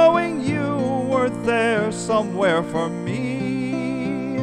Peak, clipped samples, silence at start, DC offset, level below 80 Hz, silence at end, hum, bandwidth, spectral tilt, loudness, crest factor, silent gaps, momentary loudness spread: -4 dBFS; under 0.1%; 0 s; under 0.1%; -52 dBFS; 0 s; none; 11.5 kHz; -6 dB/octave; -22 LUFS; 16 dB; none; 6 LU